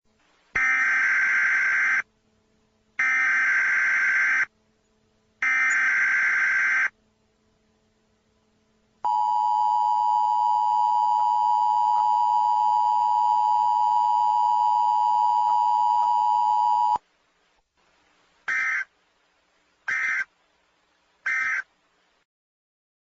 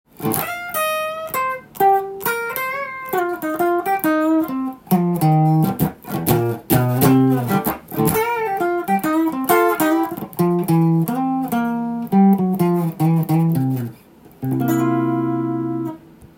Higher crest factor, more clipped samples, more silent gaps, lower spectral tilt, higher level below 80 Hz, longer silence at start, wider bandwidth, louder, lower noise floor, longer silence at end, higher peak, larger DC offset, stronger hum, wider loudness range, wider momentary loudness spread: second, 12 dB vs 18 dB; neither; neither; second, 0 dB/octave vs -6.5 dB/octave; second, -68 dBFS vs -52 dBFS; first, 0.55 s vs 0.2 s; second, 7.8 kHz vs 17 kHz; second, -22 LUFS vs -19 LUFS; first, -67 dBFS vs -45 dBFS; first, 1.55 s vs 0.1 s; second, -12 dBFS vs 0 dBFS; neither; neither; first, 8 LU vs 3 LU; about the same, 8 LU vs 8 LU